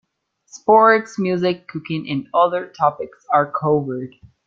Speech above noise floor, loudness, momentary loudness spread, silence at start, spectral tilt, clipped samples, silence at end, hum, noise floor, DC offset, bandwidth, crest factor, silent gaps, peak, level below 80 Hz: 43 dB; -18 LUFS; 15 LU; 0.55 s; -6.5 dB/octave; under 0.1%; 0.4 s; none; -61 dBFS; under 0.1%; 7.6 kHz; 18 dB; none; -2 dBFS; -62 dBFS